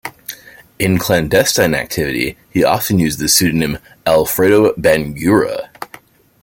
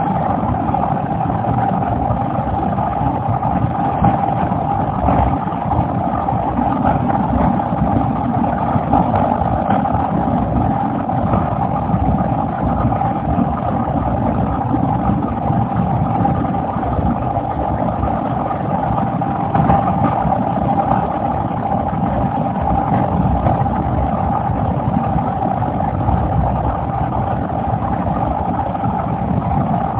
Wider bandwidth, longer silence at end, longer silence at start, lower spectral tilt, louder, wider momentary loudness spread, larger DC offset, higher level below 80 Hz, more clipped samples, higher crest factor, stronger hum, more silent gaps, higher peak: first, 17 kHz vs 4 kHz; first, 0.6 s vs 0 s; about the same, 0.05 s vs 0 s; second, -4 dB/octave vs -12.5 dB/octave; first, -14 LUFS vs -17 LUFS; first, 17 LU vs 3 LU; neither; second, -42 dBFS vs -28 dBFS; neither; about the same, 16 dB vs 16 dB; neither; neither; about the same, 0 dBFS vs 0 dBFS